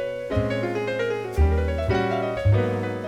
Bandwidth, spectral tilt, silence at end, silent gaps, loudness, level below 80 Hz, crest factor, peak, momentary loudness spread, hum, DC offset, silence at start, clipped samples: 11 kHz; -7.5 dB/octave; 0 s; none; -24 LUFS; -30 dBFS; 14 dB; -10 dBFS; 4 LU; none; 0.1%; 0 s; under 0.1%